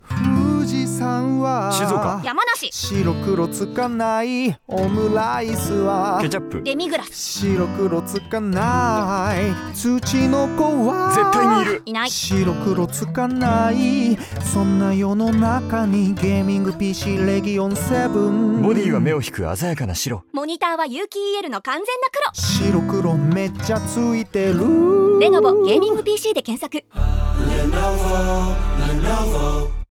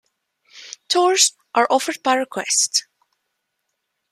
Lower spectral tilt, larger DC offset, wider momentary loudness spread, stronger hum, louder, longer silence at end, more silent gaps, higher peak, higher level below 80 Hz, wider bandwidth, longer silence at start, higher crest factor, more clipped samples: first, -5.5 dB/octave vs 0 dB/octave; neither; about the same, 7 LU vs 7 LU; neither; about the same, -19 LUFS vs -18 LUFS; second, 0.15 s vs 1.3 s; neither; about the same, -4 dBFS vs -2 dBFS; first, -30 dBFS vs -76 dBFS; first, 18.5 kHz vs 15 kHz; second, 0.1 s vs 0.55 s; second, 14 dB vs 20 dB; neither